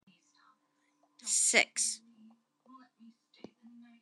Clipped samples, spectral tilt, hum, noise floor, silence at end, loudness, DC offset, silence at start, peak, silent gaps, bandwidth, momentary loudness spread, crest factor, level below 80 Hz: under 0.1%; 1 dB/octave; none; -76 dBFS; 0.35 s; -28 LUFS; under 0.1%; 1.25 s; -10 dBFS; none; 12 kHz; 18 LU; 28 dB; under -90 dBFS